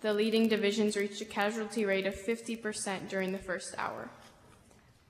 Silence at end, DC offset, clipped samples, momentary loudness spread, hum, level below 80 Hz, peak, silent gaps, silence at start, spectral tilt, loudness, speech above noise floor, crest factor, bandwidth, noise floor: 0.8 s; under 0.1%; under 0.1%; 9 LU; none; -66 dBFS; -16 dBFS; none; 0 s; -4 dB/octave; -33 LUFS; 29 dB; 18 dB; 15.5 kHz; -61 dBFS